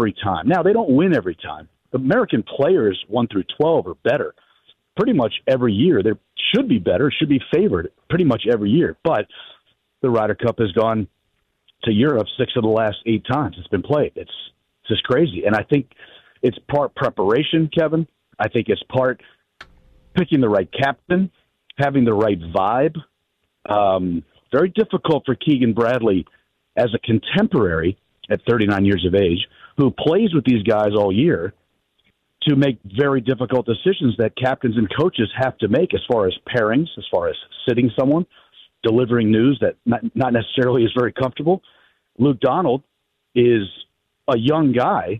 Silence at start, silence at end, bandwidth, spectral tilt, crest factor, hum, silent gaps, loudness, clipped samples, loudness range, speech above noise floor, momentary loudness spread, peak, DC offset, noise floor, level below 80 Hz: 0 s; 0 s; 6.8 kHz; -8.5 dB/octave; 14 dB; none; none; -19 LUFS; under 0.1%; 3 LU; 53 dB; 8 LU; -6 dBFS; under 0.1%; -71 dBFS; -50 dBFS